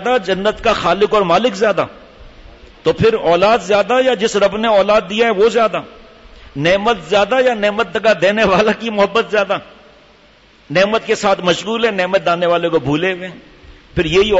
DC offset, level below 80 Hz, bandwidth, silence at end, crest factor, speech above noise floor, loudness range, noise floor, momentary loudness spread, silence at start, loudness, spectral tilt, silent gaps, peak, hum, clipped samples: under 0.1%; -42 dBFS; 8 kHz; 0 s; 12 dB; 33 dB; 3 LU; -47 dBFS; 7 LU; 0 s; -14 LUFS; -4.5 dB/octave; none; -4 dBFS; none; under 0.1%